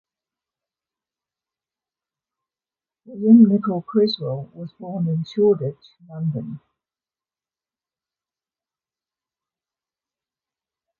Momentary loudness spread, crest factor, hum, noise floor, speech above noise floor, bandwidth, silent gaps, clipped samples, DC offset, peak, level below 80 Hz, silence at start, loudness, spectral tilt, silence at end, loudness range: 23 LU; 22 dB; none; under -90 dBFS; over 71 dB; 4.7 kHz; none; under 0.1%; under 0.1%; -2 dBFS; -68 dBFS; 3.1 s; -19 LUFS; -10 dB/octave; 4.4 s; 16 LU